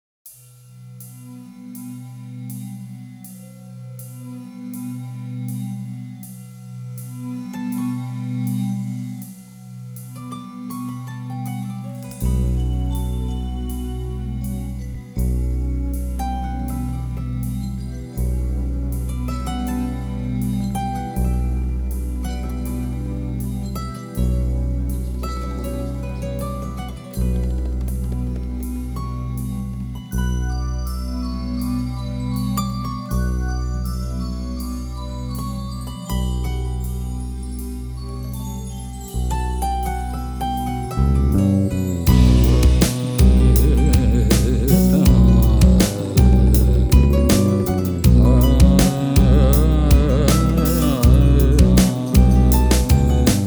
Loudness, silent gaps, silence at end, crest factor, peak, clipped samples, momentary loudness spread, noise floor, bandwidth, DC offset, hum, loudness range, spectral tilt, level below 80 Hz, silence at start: -20 LUFS; none; 0 s; 18 dB; 0 dBFS; under 0.1%; 19 LU; -44 dBFS; over 20 kHz; under 0.1%; none; 16 LU; -6.5 dB/octave; -22 dBFS; 0.25 s